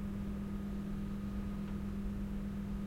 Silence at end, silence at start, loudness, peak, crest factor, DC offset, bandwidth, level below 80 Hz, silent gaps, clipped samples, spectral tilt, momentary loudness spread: 0 s; 0 s; -41 LUFS; -30 dBFS; 10 dB; under 0.1%; 16 kHz; -46 dBFS; none; under 0.1%; -8 dB/octave; 0 LU